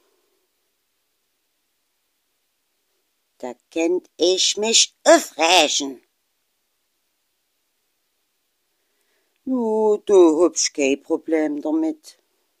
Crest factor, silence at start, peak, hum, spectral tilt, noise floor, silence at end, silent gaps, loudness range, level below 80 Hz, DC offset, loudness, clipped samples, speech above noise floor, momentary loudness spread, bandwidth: 22 dB; 3.45 s; 0 dBFS; none; -1 dB/octave; -72 dBFS; 0.65 s; none; 13 LU; -70 dBFS; under 0.1%; -18 LUFS; under 0.1%; 53 dB; 16 LU; 15.5 kHz